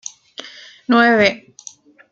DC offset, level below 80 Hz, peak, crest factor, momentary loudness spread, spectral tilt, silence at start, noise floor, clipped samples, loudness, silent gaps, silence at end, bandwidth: under 0.1%; -60 dBFS; -2 dBFS; 18 dB; 25 LU; -4 dB/octave; 0.4 s; -42 dBFS; under 0.1%; -14 LUFS; none; 0.75 s; 7.6 kHz